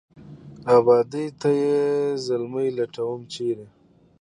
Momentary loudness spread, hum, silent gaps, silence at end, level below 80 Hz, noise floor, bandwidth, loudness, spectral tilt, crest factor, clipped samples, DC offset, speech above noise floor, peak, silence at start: 12 LU; none; none; 0.55 s; -66 dBFS; -43 dBFS; 10.5 kHz; -22 LUFS; -6.5 dB/octave; 20 dB; under 0.1%; under 0.1%; 21 dB; -4 dBFS; 0.15 s